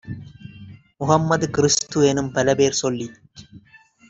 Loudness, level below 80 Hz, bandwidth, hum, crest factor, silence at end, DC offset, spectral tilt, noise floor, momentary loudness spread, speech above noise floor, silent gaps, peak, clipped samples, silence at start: -19 LUFS; -54 dBFS; 8.2 kHz; none; 20 dB; 0.5 s; under 0.1%; -4.5 dB/octave; -52 dBFS; 19 LU; 32 dB; none; -2 dBFS; under 0.1%; 0.05 s